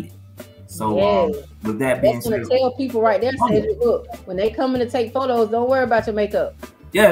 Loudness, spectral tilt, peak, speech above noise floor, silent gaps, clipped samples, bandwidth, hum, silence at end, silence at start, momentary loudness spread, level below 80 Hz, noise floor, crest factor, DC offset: -20 LUFS; -5.5 dB/octave; 0 dBFS; 21 dB; none; under 0.1%; 16 kHz; none; 0 s; 0 s; 10 LU; -44 dBFS; -41 dBFS; 20 dB; under 0.1%